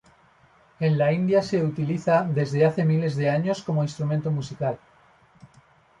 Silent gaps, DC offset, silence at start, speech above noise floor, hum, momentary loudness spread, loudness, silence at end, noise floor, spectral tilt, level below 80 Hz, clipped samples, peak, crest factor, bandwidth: none; under 0.1%; 0.8 s; 35 dB; none; 7 LU; -24 LUFS; 1.25 s; -58 dBFS; -8 dB/octave; -62 dBFS; under 0.1%; -8 dBFS; 16 dB; 8.8 kHz